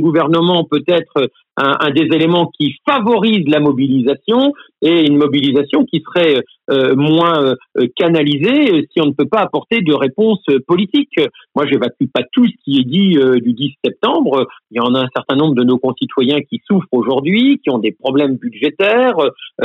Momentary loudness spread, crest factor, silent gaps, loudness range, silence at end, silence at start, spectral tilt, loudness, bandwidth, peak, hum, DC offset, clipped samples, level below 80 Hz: 6 LU; 10 dB; none; 2 LU; 0 s; 0 s; -8 dB/octave; -14 LUFS; 5.2 kHz; -4 dBFS; none; under 0.1%; under 0.1%; -62 dBFS